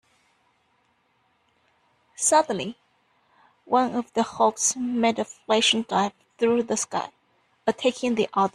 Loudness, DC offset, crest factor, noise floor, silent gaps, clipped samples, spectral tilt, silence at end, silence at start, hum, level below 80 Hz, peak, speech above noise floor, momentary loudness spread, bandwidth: -24 LUFS; under 0.1%; 20 dB; -68 dBFS; none; under 0.1%; -2.5 dB/octave; 0.05 s; 2.2 s; none; -68 dBFS; -6 dBFS; 44 dB; 10 LU; 14 kHz